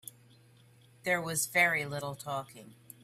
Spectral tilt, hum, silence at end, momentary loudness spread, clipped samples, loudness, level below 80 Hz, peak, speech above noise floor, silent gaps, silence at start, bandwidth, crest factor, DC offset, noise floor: -3 dB/octave; none; 0.3 s; 23 LU; under 0.1%; -31 LUFS; -72 dBFS; -14 dBFS; 28 dB; none; 0.05 s; 16 kHz; 22 dB; under 0.1%; -61 dBFS